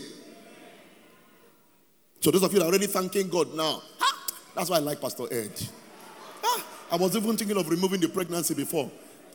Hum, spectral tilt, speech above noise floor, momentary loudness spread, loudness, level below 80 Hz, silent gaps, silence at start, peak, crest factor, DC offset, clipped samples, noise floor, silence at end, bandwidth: none; -4 dB/octave; 37 dB; 15 LU; -27 LUFS; -74 dBFS; none; 0 s; -8 dBFS; 20 dB; under 0.1%; under 0.1%; -63 dBFS; 0.05 s; over 20 kHz